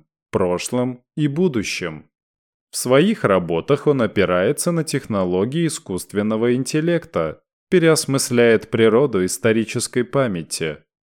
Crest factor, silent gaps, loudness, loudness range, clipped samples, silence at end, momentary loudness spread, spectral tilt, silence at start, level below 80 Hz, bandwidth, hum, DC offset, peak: 16 dB; 2.23-2.67 s, 7.53-7.67 s; -19 LUFS; 3 LU; under 0.1%; 0.3 s; 10 LU; -5 dB/octave; 0.35 s; -56 dBFS; 18 kHz; none; under 0.1%; -4 dBFS